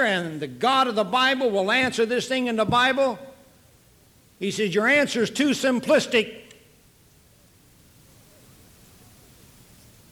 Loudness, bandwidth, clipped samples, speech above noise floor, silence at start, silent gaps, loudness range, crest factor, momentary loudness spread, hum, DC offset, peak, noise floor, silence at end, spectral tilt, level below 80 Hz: -22 LUFS; over 20 kHz; under 0.1%; 34 dB; 0 s; none; 5 LU; 16 dB; 9 LU; none; under 0.1%; -8 dBFS; -56 dBFS; 3.7 s; -4 dB/octave; -60 dBFS